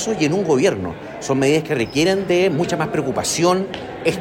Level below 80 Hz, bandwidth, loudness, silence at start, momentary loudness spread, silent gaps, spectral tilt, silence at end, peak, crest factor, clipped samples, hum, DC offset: -50 dBFS; 16.5 kHz; -19 LUFS; 0 s; 7 LU; none; -4.5 dB/octave; 0 s; -4 dBFS; 14 dB; under 0.1%; none; under 0.1%